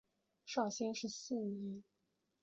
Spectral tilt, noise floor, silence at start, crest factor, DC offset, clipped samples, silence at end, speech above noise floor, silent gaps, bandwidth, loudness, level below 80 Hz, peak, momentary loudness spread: -4.5 dB/octave; -84 dBFS; 0.45 s; 20 dB; under 0.1%; under 0.1%; 0.6 s; 43 dB; none; 8 kHz; -42 LUFS; -84 dBFS; -24 dBFS; 11 LU